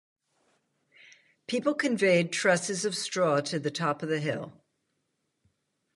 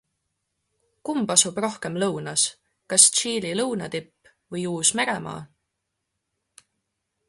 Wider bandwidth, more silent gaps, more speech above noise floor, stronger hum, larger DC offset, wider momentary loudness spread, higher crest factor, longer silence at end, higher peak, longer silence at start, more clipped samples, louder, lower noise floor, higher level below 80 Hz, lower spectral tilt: about the same, 11.5 kHz vs 12 kHz; neither; second, 51 dB vs 56 dB; neither; neither; second, 10 LU vs 18 LU; second, 20 dB vs 26 dB; second, 1.45 s vs 1.85 s; second, -10 dBFS vs -2 dBFS; first, 1.5 s vs 1.05 s; neither; second, -28 LUFS vs -21 LUFS; about the same, -79 dBFS vs -80 dBFS; second, -76 dBFS vs -66 dBFS; first, -4 dB/octave vs -2 dB/octave